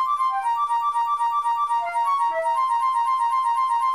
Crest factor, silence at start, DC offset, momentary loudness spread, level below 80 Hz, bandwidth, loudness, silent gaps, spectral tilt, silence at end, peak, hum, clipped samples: 8 dB; 0 s; 0.1%; 1 LU; -66 dBFS; 15 kHz; -22 LUFS; none; 0 dB/octave; 0 s; -14 dBFS; none; under 0.1%